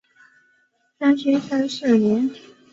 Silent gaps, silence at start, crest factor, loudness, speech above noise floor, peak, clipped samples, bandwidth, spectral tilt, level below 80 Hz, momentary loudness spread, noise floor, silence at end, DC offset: none; 1 s; 16 dB; -20 LUFS; 45 dB; -6 dBFS; under 0.1%; 7.8 kHz; -6 dB/octave; -66 dBFS; 6 LU; -64 dBFS; 0.35 s; under 0.1%